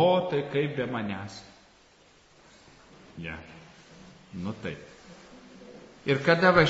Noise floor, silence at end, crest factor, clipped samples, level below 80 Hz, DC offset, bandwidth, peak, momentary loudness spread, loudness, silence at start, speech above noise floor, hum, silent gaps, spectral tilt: -59 dBFS; 0 s; 22 dB; under 0.1%; -58 dBFS; under 0.1%; 8 kHz; -6 dBFS; 26 LU; -28 LUFS; 0 s; 32 dB; none; none; -4 dB/octave